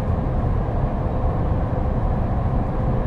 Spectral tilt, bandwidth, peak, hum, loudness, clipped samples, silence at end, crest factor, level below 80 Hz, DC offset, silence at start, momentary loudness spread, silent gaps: -10.5 dB/octave; 4.7 kHz; -8 dBFS; none; -23 LUFS; under 0.1%; 0 s; 12 dB; -24 dBFS; under 0.1%; 0 s; 1 LU; none